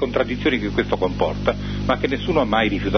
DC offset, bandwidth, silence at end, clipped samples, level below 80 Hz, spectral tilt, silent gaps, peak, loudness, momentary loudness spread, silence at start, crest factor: under 0.1%; 6.6 kHz; 0 s; under 0.1%; -34 dBFS; -7 dB/octave; none; -4 dBFS; -21 LUFS; 4 LU; 0 s; 16 dB